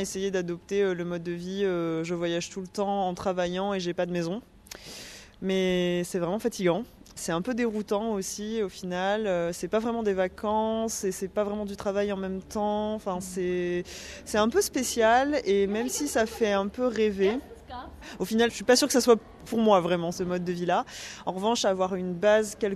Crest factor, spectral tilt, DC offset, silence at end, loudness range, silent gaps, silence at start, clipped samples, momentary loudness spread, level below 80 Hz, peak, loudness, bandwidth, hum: 20 dB; -4.5 dB/octave; under 0.1%; 0 s; 5 LU; none; 0 s; under 0.1%; 12 LU; -54 dBFS; -8 dBFS; -27 LUFS; 13.5 kHz; none